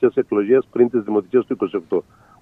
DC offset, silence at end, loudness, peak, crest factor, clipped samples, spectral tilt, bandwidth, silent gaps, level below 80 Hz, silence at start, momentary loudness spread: under 0.1%; 0.4 s; -19 LUFS; -4 dBFS; 16 dB; under 0.1%; -9.5 dB/octave; 3.6 kHz; none; -62 dBFS; 0 s; 7 LU